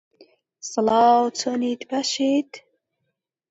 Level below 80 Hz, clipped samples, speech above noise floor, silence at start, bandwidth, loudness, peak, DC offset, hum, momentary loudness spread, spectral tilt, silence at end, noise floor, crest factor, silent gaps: -68 dBFS; under 0.1%; 57 dB; 0.65 s; 8 kHz; -21 LUFS; -6 dBFS; under 0.1%; none; 13 LU; -3 dB/octave; 0.9 s; -78 dBFS; 18 dB; none